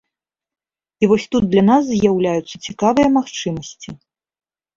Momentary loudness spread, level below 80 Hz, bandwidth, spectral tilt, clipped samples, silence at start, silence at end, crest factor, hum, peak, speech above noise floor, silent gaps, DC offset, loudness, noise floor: 16 LU; -48 dBFS; 7.6 kHz; -6 dB/octave; under 0.1%; 1 s; 0.8 s; 16 dB; none; -2 dBFS; 67 dB; none; under 0.1%; -16 LUFS; -84 dBFS